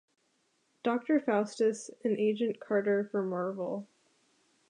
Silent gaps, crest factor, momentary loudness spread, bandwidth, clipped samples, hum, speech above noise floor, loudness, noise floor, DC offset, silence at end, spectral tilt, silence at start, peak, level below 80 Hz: none; 16 dB; 8 LU; 10.5 kHz; under 0.1%; none; 44 dB; -32 LUFS; -74 dBFS; under 0.1%; 0.85 s; -6 dB/octave; 0.85 s; -16 dBFS; -88 dBFS